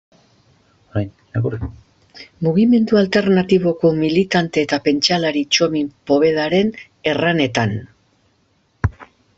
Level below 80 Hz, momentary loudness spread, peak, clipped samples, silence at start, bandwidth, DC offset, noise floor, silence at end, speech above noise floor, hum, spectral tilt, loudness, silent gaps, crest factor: -46 dBFS; 11 LU; 0 dBFS; under 0.1%; 0.95 s; 8 kHz; under 0.1%; -61 dBFS; 0.35 s; 44 dB; none; -5.5 dB/octave; -17 LUFS; none; 18 dB